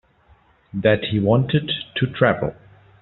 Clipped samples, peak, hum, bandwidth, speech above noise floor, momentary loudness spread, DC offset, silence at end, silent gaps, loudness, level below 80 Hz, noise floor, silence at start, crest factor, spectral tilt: under 0.1%; -2 dBFS; none; 4.2 kHz; 36 dB; 7 LU; under 0.1%; 0.5 s; none; -20 LUFS; -50 dBFS; -56 dBFS; 0.75 s; 18 dB; -5 dB/octave